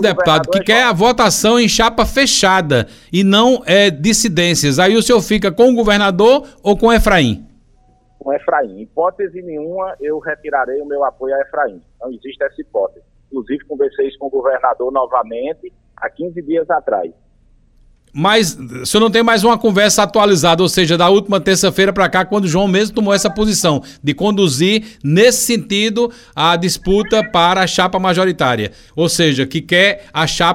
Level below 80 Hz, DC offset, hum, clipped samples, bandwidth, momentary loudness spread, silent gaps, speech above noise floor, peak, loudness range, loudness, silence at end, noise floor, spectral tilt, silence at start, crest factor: -36 dBFS; under 0.1%; none; under 0.1%; 16.5 kHz; 12 LU; none; 37 dB; 0 dBFS; 9 LU; -14 LUFS; 0 s; -51 dBFS; -4 dB/octave; 0 s; 14 dB